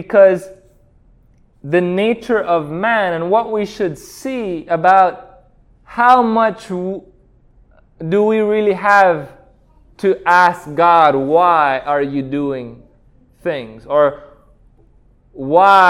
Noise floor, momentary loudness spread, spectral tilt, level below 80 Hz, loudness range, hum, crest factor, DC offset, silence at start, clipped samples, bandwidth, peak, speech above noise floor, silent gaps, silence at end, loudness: -51 dBFS; 14 LU; -6 dB/octave; -50 dBFS; 5 LU; none; 16 dB; under 0.1%; 0 s; 0.1%; 15 kHz; 0 dBFS; 37 dB; none; 0 s; -15 LUFS